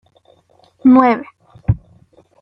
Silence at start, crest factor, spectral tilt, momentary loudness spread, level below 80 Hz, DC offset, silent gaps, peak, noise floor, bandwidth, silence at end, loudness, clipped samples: 0.85 s; 14 dB; -10.5 dB/octave; 13 LU; -38 dBFS; under 0.1%; none; -2 dBFS; -53 dBFS; 5.6 kHz; 0.65 s; -15 LUFS; under 0.1%